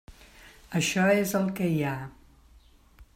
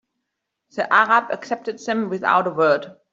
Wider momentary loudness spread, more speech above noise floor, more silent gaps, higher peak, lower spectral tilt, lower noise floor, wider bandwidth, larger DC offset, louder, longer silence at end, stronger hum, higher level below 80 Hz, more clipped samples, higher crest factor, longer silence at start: about the same, 12 LU vs 12 LU; second, 31 dB vs 59 dB; neither; second, -12 dBFS vs -2 dBFS; about the same, -5 dB/octave vs -5 dB/octave; second, -57 dBFS vs -79 dBFS; first, 16 kHz vs 7.8 kHz; neither; second, -27 LUFS vs -20 LUFS; about the same, 0.15 s vs 0.2 s; neither; first, -56 dBFS vs -70 dBFS; neither; about the same, 18 dB vs 18 dB; second, 0.1 s vs 0.75 s